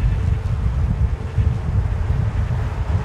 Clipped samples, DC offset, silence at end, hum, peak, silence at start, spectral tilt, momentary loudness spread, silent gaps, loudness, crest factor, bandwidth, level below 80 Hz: under 0.1%; under 0.1%; 0 s; none; -6 dBFS; 0 s; -8.5 dB/octave; 2 LU; none; -22 LUFS; 12 dB; 8.4 kHz; -22 dBFS